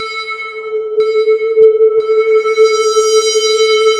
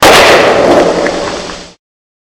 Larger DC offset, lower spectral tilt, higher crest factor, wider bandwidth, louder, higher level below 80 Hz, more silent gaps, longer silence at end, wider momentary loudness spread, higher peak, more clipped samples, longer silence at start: neither; second, 0.5 dB/octave vs -3 dB/octave; about the same, 10 dB vs 8 dB; second, 11.5 kHz vs over 20 kHz; second, -11 LUFS vs -7 LUFS; second, -62 dBFS vs -34 dBFS; neither; second, 0 s vs 0.7 s; second, 11 LU vs 19 LU; about the same, 0 dBFS vs 0 dBFS; second, under 0.1% vs 4%; about the same, 0 s vs 0 s